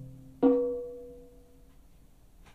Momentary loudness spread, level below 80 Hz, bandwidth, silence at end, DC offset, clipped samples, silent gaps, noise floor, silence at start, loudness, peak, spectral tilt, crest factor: 23 LU; -56 dBFS; 4.3 kHz; 1.35 s; under 0.1%; under 0.1%; none; -58 dBFS; 0 s; -28 LUFS; -12 dBFS; -9 dB/octave; 22 dB